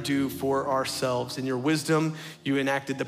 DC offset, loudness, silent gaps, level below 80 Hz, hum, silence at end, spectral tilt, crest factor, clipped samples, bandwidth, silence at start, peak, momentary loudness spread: under 0.1%; -27 LUFS; none; -70 dBFS; none; 0 s; -5 dB/octave; 16 dB; under 0.1%; 16 kHz; 0 s; -12 dBFS; 5 LU